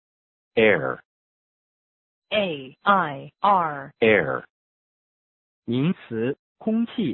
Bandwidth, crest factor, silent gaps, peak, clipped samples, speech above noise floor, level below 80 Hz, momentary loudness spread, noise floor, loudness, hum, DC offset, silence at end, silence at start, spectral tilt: 4.2 kHz; 20 dB; 1.05-2.22 s, 4.50-5.62 s, 6.39-6.55 s; -4 dBFS; under 0.1%; over 68 dB; -62 dBFS; 11 LU; under -90 dBFS; -23 LUFS; none; under 0.1%; 0 s; 0.55 s; -10.5 dB/octave